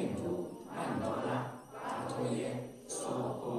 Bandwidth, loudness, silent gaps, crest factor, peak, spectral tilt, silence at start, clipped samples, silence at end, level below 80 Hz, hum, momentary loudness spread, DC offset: 13.5 kHz; -38 LUFS; none; 16 dB; -22 dBFS; -5.5 dB/octave; 0 s; under 0.1%; 0 s; -70 dBFS; none; 7 LU; under 0.1%